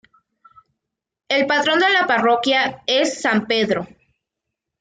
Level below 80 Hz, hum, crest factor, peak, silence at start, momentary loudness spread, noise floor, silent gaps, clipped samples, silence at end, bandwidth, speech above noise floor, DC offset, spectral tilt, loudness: -64 dBFS; none; 16 dB; -6 dBFS; 1.3 s; 7 LU; -83 dBFS; none; under 0.1%; 0.95 s; 9.4 kHz; 65 dB; under 0.1%; -3 dB/octave; -18 LUFS